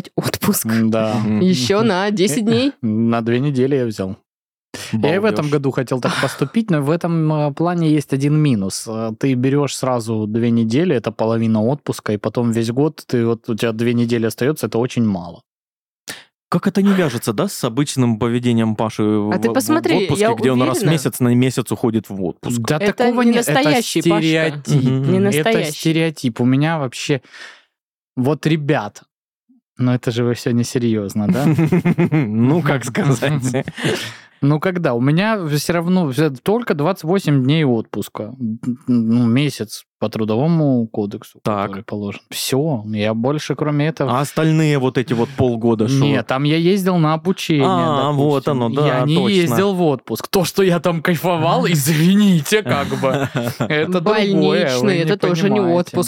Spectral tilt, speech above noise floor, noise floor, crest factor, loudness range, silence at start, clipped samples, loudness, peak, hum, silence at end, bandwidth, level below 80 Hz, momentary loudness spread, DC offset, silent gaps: -6 dB/octave; over 73 dB; under -90 dBFS; 16 dB; 4 LU; 0.05 s; under 0.1%; -17 LUFS; -2 dBFS; none; 0 s; 17.5 kHz; -58 dBFS; 7 LU; under 0.1%; 4.26-4.73 s, 15.50-16.07 s, 16.34-16.51 s, 27.83-28.16 s, 29.11-29.47 s, 29.62-29.76 s, 39.87-40.00 s